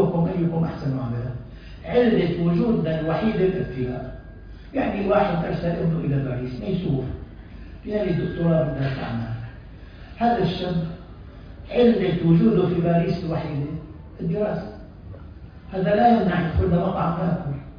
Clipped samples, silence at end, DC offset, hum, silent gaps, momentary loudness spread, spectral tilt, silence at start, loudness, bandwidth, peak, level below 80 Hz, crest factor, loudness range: under 0.1%; 0 s; under 0.1%; none; none; 22 LU; -10 dB/octave; 0 s; -23 LUFS; 5.2 kHz; -6 dBFS; -40 dBFS; 16 dB; 4 LU